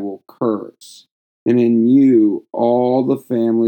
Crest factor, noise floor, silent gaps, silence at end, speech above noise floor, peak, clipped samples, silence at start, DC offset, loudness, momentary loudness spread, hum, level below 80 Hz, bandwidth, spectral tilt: 12 dB; -40 dBFS; 1.11-1.46 s; 0 s; 26 dB; -2 dBFS; under 0.1%; 0 s; under 0.1%; -15 LUFS; 13 LU; none; -80 dBFS; 16.5 kHz; -8.5 dB/octave